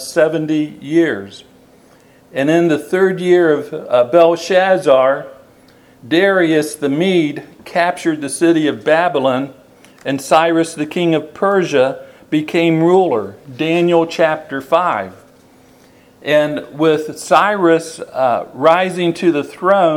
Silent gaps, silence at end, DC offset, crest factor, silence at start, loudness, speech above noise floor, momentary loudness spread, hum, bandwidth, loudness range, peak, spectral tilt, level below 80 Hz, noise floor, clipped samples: none; 0 s; under 0.1%; 14 dB; 0 s; -15 LUFS; 33 dB; 10 LU; none; 14.5 kHz; 3 LU; 0 dBFS; -5.5 dB/octave; -62 dBFS; -47 dBFS; under 0.1%